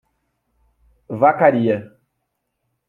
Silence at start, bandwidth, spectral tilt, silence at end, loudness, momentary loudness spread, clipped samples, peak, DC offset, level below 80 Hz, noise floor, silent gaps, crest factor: 1.1 s; 4.3 kHz; -9.5 dB/octave; 1.05 s; -17 LUFS; 12 LU; under 0.1%; 0 dBFS; under 0.1%; -64 dBFS; -75 dBFS; none; 20 dB